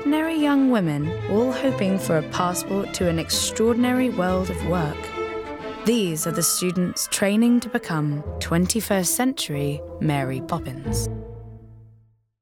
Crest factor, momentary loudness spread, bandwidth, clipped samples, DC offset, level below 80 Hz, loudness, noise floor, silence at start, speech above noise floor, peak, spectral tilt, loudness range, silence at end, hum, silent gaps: 16 dB; 9 LU; 19.5 kHz; under 0.1%; under 0.1%; -42 dBFS; -23 LUFS; -56 dBFS; 0 s; 34 dB; -6 dBFS; -4.5 dB/octave; 2 LU; 0.55 s; none; none